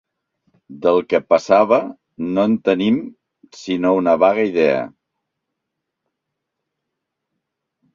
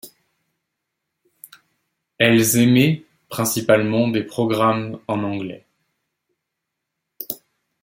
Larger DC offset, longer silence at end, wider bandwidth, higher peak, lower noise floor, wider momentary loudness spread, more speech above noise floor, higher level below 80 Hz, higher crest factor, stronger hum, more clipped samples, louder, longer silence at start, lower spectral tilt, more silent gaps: neither; first, 3.05 s vs 0.45 s; second, 7.6 kHz vs 16.5 kHz; about the same, -2 dBFS vs -2 dBFS; about the same, -79 dBFS vs -80 dBFS; about the same, 14 LU vs 16 LU; about the same, 63 dB vs 62 dB; about the same, -62 dBFS vs -60 dBFS; about the same, 18 dB vs 20 dB; neither; neither; about the same, -17 LUFS vs -18 LUFS; first, 0.7 s vs 0.05 s; first, -6.5 dB/octave vs -5 dB/octave; neither